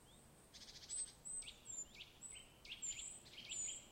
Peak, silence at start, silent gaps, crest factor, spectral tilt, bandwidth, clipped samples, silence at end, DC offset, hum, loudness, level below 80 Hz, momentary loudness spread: -36 dBFS; 0 s; none; 16 dB; 0.5 dB/octave; 16 kHz; under 0.1%; 0 s; under 0.1%; none; -49 LUFS; -72 dBFS; 13 LU